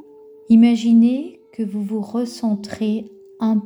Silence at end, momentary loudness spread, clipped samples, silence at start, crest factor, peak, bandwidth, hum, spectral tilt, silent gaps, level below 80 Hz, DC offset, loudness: 0 s; 13 LU; under 0.1%; 0.5 s; 14 dB; -4 dBFS; 10.5 kHz; none; -7 dB/octave; none; -62 dBFS; under 0.1%; -18 LUFS